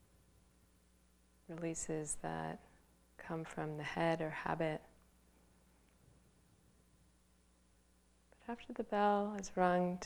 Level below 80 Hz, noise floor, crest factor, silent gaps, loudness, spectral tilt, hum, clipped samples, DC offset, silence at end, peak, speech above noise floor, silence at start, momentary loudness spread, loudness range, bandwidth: -68 dBFS; -71 dBFS; 24 dB; none; -39 LUFS; -5 dB/octave; none; under 0.1%; under 0.1%; 0 s; -18 dBFS; 33 dB; 1.5 s; 15 LU; 8 LU; over 20 kHz